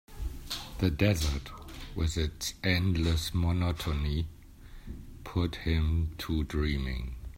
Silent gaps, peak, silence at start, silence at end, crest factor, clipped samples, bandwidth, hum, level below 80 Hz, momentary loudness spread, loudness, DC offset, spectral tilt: none; -12 dBFS; 0.1 s; 0 s; 18 dB; under 0.1%; 16 kHz; none; -38 dBFS; 15 LU; -31 LUFS; under 0.1%; -5.5 dB/octave